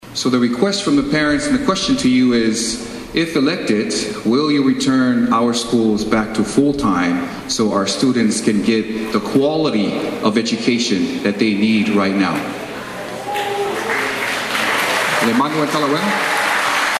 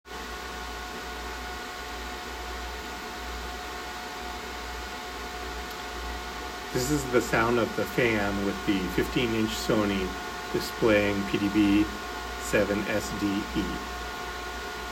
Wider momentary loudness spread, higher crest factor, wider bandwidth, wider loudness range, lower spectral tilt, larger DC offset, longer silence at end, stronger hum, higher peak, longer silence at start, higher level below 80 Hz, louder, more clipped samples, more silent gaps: second, 5 LU vs 12 LU; about the same, 16 dB vs 20 dB; second, 14.5 kHz vs 16 kHz; second, 2 LU vs 9 LU; about the same, -4 dB/octave vs -4.5 dB/octave; neither; about the same, 0 s vs 0 s; neither; first, 0 dBFS vs -10 dBFS; about the same, 0.05 s vs 0.05 s; about the same, -46 dBFS vs -44 dBFS; first, -17 LUFS vs -29 LUFS; neither; neither